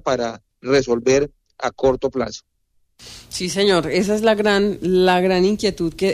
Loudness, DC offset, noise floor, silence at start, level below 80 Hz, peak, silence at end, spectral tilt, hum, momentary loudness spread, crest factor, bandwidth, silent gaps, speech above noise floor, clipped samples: -19 LUFS; under 0.1%; -61 dBFS; 0.05 s; -46 dBFS; -6 dBFS; 0 s; -5 dB/octave; none; 12 LU; 14 dB; 14.5 kHz; none; 43 dB; under 0.1%